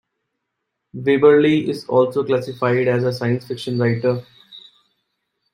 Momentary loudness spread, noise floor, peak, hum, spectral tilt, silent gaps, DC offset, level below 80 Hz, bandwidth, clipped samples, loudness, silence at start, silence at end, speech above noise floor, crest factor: 11 LU; -77 dBFS; -2 dBFS; none; -7.5 dB/octave; none; under 0.1%; -62 dBFS; 15 kHz; under 0.1%; -18 LUFS; 0.95 s; 0.95 s; 60 dB; 18 dB